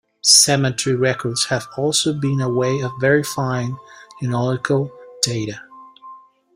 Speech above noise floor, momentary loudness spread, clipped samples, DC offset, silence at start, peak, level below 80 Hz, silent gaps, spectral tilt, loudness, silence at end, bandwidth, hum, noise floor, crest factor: 24 dB; 16 LU; under 0.1%; under 0.1%; 0.25 s; 0 dBFS; -56 dBFS; none; -3.5 dB/octave; -18 LUFS; 0.4 s; 16 kHz; none; -43 dBFS; 20 dB